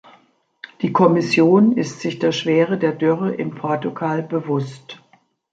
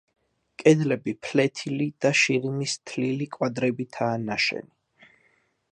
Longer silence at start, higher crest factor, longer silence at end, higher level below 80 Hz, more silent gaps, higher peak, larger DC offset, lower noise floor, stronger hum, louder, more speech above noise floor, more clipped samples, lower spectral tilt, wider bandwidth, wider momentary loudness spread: first, 0.8 s vs 0.6 s; second, 16 dB vs 22 dB; second, 0.6 s vs 1.1 s; about the same, -66 dBFS vs -70 dBFS; neither; about the same, -2 dBFS vs -4 dBFS; neither; second, -55 dBFS vs -66 dBFS; neither; first, -18 LUFS vs -25 LUFS; second, 38 dB vs 42 dB; neither; first, -6.5 dB/octave vs -5 dB/octave; second, 9 kHz vs 10.5 kHz; first, 11 LU vs 8 LU